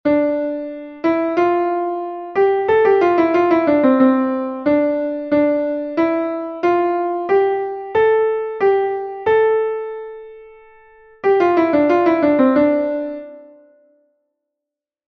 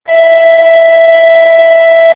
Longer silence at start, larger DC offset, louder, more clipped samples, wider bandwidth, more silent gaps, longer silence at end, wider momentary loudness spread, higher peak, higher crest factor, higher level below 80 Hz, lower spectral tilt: about the same, 0.05 s vs 0.1 s; neither; second, -17 LUFS vs -4 LUFS; second, under 0.1% vs 7%; first, 6.2 kHz vs 4 kHz; neither; first, 1.65 s vs 0 s; first, 10 LU vs 0 LU; about the same, -2 dBFS vs 0 dBFS; first, 16 dB vs 4 dB; about the same, -56 dBFS vs -58 dBFS; first, -7.5 dB/octave vs -4 dB/octave